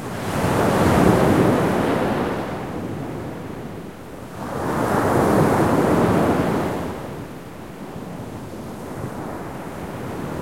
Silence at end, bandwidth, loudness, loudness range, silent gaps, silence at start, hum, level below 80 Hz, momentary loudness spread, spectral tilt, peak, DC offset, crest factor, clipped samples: 0 s; 16.5 kHz; -21 LUFS; 12 LU; none; 0 s; none; -42 dBFS; 17 LU; -6.5 dB/octave; -4 dBFS; 0.5%; 18 dB; under 0.1%